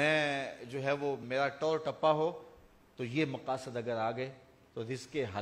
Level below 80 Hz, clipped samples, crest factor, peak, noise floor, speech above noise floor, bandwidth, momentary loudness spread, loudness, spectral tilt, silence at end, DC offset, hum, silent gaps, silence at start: -72 dBFS; under 0.1%; 20 dB; -14 dBFS; -59 dBFS; 26 dB; 13 kHz; 12 LU; -35 LUFS; -5.5 dB/octave; 0 s; under 0.1%; none; none; 0 s